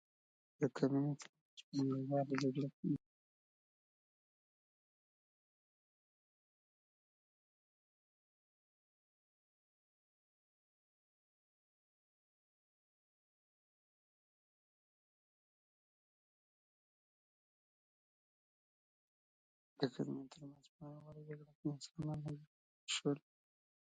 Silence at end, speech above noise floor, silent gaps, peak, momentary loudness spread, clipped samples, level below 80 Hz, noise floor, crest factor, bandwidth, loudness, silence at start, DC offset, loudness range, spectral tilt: 0.75 s; over 49 dB; 1.29-1.33 s, 1.41-1.57 s, 1.63-1.72 s, 2.73-2.83 s, 3.06-19.76 s, 20.69-20.79 s, 21.55-21.63 s, 22.47-22.87 s; -20 dBFS; 18 LU; under 0.1%; -84 dBFS; under -90 dBFS; 28 dB; 7.6 kHz; -42 LUFS; 0.6 s; under 0.1%; 9 LU; -6 dB/octave